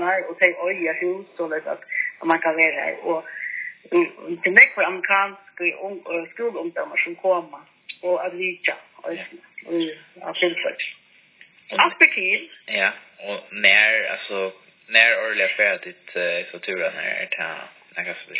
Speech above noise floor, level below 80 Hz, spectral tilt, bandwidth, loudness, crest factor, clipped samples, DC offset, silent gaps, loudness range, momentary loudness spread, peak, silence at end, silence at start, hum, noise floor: 30 dB; -82 dBFS; -6 dB/octave; 4 kHz; -20 LUFS; 22 dB; under 0.1%; under 0.1%; none; 8 LU; 16 LU; 0 dBFS; 0 s; 0 s; none; -53 dBFS